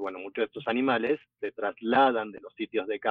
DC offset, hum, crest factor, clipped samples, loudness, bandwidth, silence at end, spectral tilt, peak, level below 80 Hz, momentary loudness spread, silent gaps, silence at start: under 0.1%; none; 16 dB; under 0.1%; -28 LUFS; 5 kHz; 0 s; -7.5 dB/octave; -12 dBFS; -74 dBFS; 13 LU; none; 0 s